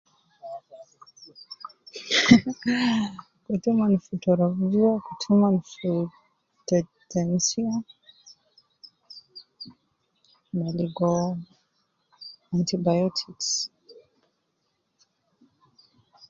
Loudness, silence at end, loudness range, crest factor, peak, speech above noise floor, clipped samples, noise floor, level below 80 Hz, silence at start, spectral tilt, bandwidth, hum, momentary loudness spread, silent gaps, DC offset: -24 LUFS; 2.4 s; 9 LU; 26 dB; 0 dBFS; 51 dB; under 0.1%; -75 dBFS; -62 dBFS; 0.45 s; -5 dB/octave; 7.6 kHz; none; 23 LU; none; under 0.1%